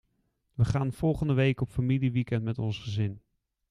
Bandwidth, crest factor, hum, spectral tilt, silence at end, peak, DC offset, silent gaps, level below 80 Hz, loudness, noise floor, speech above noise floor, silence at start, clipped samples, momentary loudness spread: 11 kHz; 18 dB; none; -8 dB/octave; 0.5 s; -12 dBFS; under 0.1%; none; -50 dBFS; -29 LUFS; -75 dBFS; 47 dB; 0.6 s; under 0.1%; 7 LU